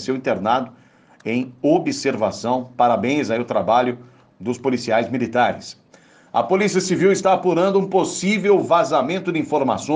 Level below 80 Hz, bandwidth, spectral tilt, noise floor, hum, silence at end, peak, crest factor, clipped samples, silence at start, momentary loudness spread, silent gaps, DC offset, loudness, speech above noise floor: -62 dBFS; 9.8 kHz; -5 dB/octave; -51 dBFS; none; 0 s; -4 dBFS; 16 dB; under 0.1%; 0 s; 8 LU; none; under 0.1%; -19 LUFS; 32 dB